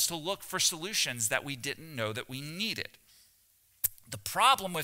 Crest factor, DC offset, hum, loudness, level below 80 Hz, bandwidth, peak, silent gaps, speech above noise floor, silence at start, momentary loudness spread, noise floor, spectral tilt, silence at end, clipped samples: 26 dB; under 0.1%; none; -31 LUFS; -66 dBFS; 16.5 kHz; -8 dBFS; none; 35 dB; 0 s; 13 LU; -67 dBFS; -1.5 dB/octave; 0 s; under 0.1%